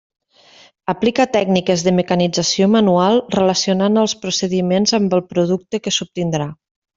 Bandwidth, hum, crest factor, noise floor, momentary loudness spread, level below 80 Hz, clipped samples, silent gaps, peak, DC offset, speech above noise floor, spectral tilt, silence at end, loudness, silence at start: 7.6 kHz; none; 16 dB; -48 dBFS; 8 LU; -56 dBFS; under 0.1%; none; -2 dBFS; under 0.1%; 32 dB; -5 dB/octave; 0.45 s; -16 LUFS; 0.9 s